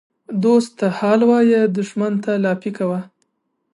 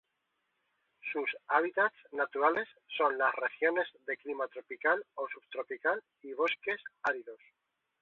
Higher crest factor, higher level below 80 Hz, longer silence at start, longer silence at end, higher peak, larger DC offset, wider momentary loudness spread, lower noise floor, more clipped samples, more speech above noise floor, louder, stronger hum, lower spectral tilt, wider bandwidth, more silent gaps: second, 16 dB vs 24 dB; first, -70 dBFS vs -82 dBFS; second, 0.3 s vs 1.05 s; about the same, 0.7 s vs 0.65 s; first, -2 dBFS vs -12 dBFS; neither; about the same, 9 LU vs 11 LU; second, -71 dBFS vs -82 dBFS; neither; first, 55 dB vs 48 dB; first, -18 LUFS vs -33 LUFS; neither; first, -7 dB/octave vs 0.5 dB/octave; first, 11 kHz vs 4.5 kHz; neither